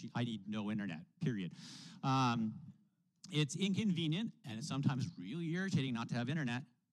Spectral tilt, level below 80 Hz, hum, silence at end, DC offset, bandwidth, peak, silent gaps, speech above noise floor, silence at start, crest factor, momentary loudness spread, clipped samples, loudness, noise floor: -5.5 dB/octave; -80 dBFS; none; 0.25 s; under 0.1%; 11.5 kHz; -22 dBFS; none; 26 dB; 0 s; 18 dB; 9 LU; under 0.1%; -39 LUFS; -64 dBFS